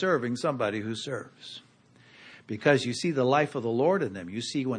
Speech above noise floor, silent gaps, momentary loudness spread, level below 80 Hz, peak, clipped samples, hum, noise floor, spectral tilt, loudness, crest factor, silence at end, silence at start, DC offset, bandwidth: 30 dB; none; 16 LU; -72 dBFS; -8 dBFS; under 0.1%; none; -58 dBFS; -5.5 dB/octave; -28 LUFS; 20 dB; 0 s; 0 s; under 0.1%; 10 kHz